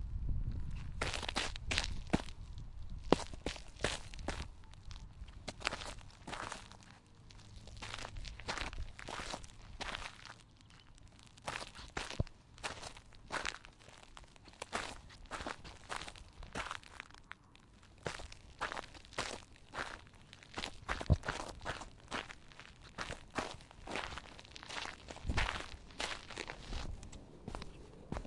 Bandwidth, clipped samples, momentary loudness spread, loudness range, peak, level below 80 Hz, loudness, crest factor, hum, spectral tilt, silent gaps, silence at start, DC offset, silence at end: 11.5 kHz; under 0.1%; 18 LU; 7 LU; -6 dBFS; -50 dBFS; -43 LUFS; 36 dB; none; -4 dB/octave; none; 0 s; under 0.1%; 0 s